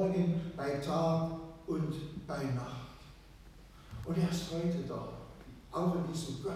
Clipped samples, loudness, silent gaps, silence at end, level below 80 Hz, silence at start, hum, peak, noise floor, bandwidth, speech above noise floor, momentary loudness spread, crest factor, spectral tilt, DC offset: under 0.1%; -36 LUFS; none; 0 s; -56 dBFS; 0 s; none; -20 dBFS; -55 dBFS; 14 kHz; 20 dB; 19 LU; 16 dB; -7 dB/octave; under 0.1%